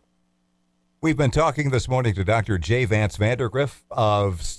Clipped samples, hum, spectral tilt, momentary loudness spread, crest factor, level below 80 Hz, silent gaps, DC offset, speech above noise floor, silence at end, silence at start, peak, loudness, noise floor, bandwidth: under 0.1%; none; -6 dB/octave; 4 LU; 14 dB; -40 dBFS; none; under 0.1%; 46 dB; 0 s; 1.05 s; -8 dBFS; -22 LUFS; -68 dBFS; 11 kHz